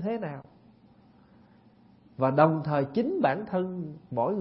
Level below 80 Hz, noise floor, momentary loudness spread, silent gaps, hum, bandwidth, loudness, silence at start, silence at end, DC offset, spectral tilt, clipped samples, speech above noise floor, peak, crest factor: -68 dBFS; -58 dBFS; 15 LU; none; none; 5.8 kHz; -28 LUFS; 0 s; 0 s; under 0.1%; -11.5 dB/octave; under 0.1%; 31 dB; -6 dBFS; 24 dB